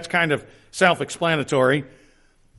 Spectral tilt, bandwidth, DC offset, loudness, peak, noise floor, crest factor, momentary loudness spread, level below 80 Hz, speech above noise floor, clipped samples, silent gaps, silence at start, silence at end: -4.5 dB/octave; 11.5 kHz; under 0.1%; -21 LUFS; -4 dBFS; -56 dBFS; 18 dB; 7 LU; -58 dBFS; 35 dB; under 0.1%; none; 0 s; 0.7 s